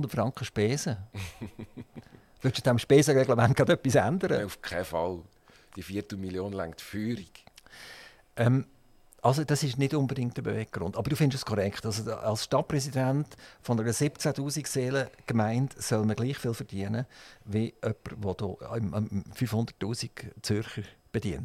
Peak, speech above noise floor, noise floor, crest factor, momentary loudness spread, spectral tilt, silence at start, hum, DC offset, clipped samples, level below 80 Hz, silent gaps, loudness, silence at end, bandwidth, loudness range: -8 dBFS; 29 dB; -57 dBFS; 20 dB; 17 LU; -5.5 dB/octave; 0 s; none; under 0.1%; under 0.1%; -56 dBFS; none; -29 LUFS; 0 s; 15.5 kHz; 8 LU